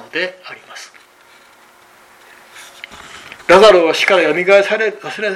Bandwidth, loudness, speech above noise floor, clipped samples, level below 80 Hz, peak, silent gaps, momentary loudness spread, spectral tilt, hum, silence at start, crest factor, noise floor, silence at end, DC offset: 14 kHz; -11 LUFS; 34 dB; under 0.1%; -52 dBFS; 0 dBFS; none; 26 LU; -3.5 dB/octave; none; 0.15 s; 16 dB; -46 dBFS; 0 s; under 0.1%